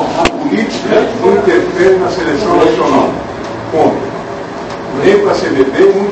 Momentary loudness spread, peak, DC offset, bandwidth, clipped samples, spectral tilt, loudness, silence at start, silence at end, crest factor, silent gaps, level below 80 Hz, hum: 12 LU; 0 dBFS; under 0.1%; 8.6 kHz; 0.2%; -5.5 dB/octave; -11 LUFS; 0 s; 0 s; 12 dB; none; -38 dBFS; none